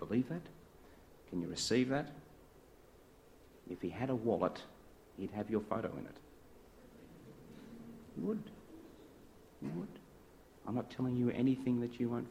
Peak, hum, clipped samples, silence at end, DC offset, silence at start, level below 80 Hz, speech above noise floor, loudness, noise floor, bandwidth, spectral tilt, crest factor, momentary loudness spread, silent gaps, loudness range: -18 dBFS; none; under 0.1%; 0 s; under 0.1%; 0 s; -66 dBFS; 25 dB; -39 LUFS; -62 dBFS; 15.5 kHz; -6 dB/octave; 22 dB; 25 LU; none; 8 LU